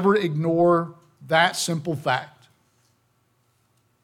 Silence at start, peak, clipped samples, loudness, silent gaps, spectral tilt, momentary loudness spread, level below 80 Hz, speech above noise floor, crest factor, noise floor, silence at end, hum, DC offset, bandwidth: 0 s; -6 dBFS; under 0.1%; -22 LUFS; none; -5 dB/octave; 8 LU; -70 dBFS; 45 dB; 18 dB; -67 dBFS; 1.75 s; 60 Hz at -55 dBFS; under 0.1%; 16.5 kHz